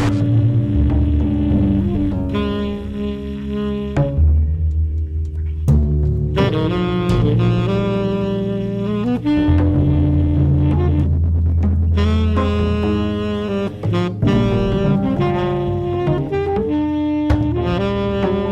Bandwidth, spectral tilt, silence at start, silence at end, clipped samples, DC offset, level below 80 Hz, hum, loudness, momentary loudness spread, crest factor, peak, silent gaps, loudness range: 7.2 kHz; -9 dB/octave; 0 s; 0 s; under 0.1%; under 0.1%; -26 dBFS; none; -18 LUFS; 6 LU; 12 dB; -4 dBFS; none; 3 LU